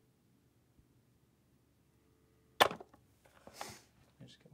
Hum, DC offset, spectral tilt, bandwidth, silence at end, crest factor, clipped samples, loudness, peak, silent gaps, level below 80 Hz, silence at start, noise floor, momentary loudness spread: none; under 0.1%; -2 dB/octave; 16 kHz; 0.3 s; 34 dB; under 0.1%; -32 LUFS; -10 dBFS; none; -78 dBFS; 2.6 s; -72 dBFS; 26 LU